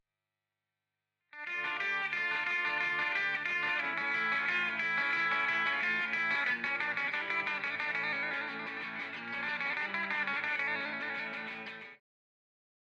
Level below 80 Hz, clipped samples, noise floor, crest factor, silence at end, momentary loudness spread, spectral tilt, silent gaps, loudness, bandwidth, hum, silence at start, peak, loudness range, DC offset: -86 dBFS; under 0.1%; under -90 dBFS; 18 dB; 1.05 s; 9 LU; -3 dB/octave; none; -32 LUFS; 11 kHz; 50 Hz at -80 dBFS; 1.35 s; -18 dBFS; 4 LU; under 0.1%